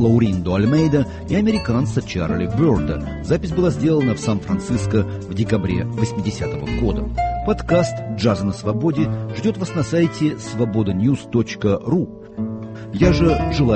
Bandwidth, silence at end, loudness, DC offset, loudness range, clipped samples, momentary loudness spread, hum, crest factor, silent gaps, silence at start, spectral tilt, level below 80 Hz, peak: 8.8 kHz; 0 s; -20 LUFS; under 0.1%; 2 LU; under 0.1%; 7 LU; none; 16 dB; none; 0 s; -7.5 dB/octave; -34 dBFS; -2 dBFS